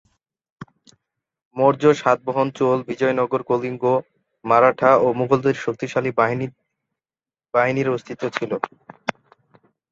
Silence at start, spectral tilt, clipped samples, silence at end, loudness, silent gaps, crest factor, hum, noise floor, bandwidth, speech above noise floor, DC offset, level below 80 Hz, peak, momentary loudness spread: 0.6 s; -6.5 dB/octave; under 0.1%; 0.8 s; -20 LUFS; 1.45-1.51 s; 20 dB; none; under -90 dBFS; 7.8 kHz; over 71 dB; under 0.1%; -64 dBFS; -2 dBFS; 14 LU